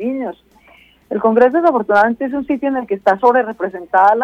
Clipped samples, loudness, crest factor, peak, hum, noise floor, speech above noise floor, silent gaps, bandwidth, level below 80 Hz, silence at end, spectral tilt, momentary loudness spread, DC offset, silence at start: under 0.1%; -15 LUFS; 14 dB; -2 dBFS; none; -48 dBFS; 34 dB; none; 7.4 kHz; -56 dBFS; 0 s; -7 dB/octave; 12 LU; under 0.1%; 0 s